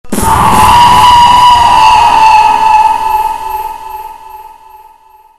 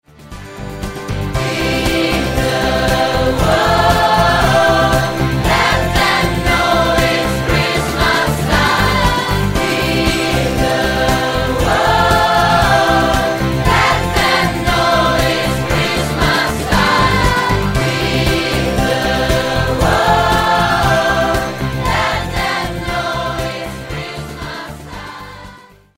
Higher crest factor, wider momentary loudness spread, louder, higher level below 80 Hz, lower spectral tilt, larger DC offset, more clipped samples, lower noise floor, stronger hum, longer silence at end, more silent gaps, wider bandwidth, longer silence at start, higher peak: second, 6 dB vs 14 dB; first, 17 LU vs 11 LU; first, -5 LUFS vs -14 LUFS; about the same, -26 dBFS vs -26 dBFS; second, -3 dB/octave vs -4.5 dB/octave; second, under 0.1% vs 0.3%; first, 2% vs under 0.1%; about the same, -40 dBFS vs -40 dBFS; first, 60 Hz at -40 dBFS vs none; second, 0 s vs 0.4 s; neither; second, 14.5 kHz vs 16.5 kHz; second, 0.05 s vs 0.2 s; about the same, 0 dBFS vs 0 dBFS